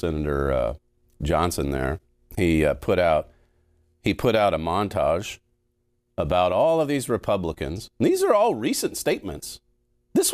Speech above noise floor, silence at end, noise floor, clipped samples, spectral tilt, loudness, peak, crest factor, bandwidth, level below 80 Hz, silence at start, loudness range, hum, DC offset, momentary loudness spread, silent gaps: 48 dB; 0 s; -71 dBFS; under 0.1%; -5 dB/octave; -23 LUFS; -6 dBFS; 16 dB; 16 kHz; -40 dBFS; 0.05 s; 2 LU; none; under 0.1%; 16 LU; none